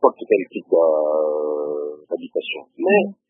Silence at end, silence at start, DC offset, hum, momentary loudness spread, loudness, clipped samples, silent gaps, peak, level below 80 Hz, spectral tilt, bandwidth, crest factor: 0.15 s; 0 s; under 0.1%; none; 11 LU; -21 LUFS; under 0.1%; none; 0 dBFS; -76 dBFS; -10 dB/octave; 3.8 kHz; 20 dB